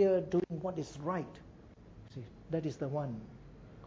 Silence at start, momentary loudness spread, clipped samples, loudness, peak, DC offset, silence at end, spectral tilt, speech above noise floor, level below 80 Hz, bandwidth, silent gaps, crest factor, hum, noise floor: 0 s; 22 LU; under 0.1%; -37 LUFS; -18 dBFS; under 0.1%; 0 s; -8 dB/octave; 20 dB; -60 dBFS; 7.8 kHz; none; 18 dB; none; -55 dBFS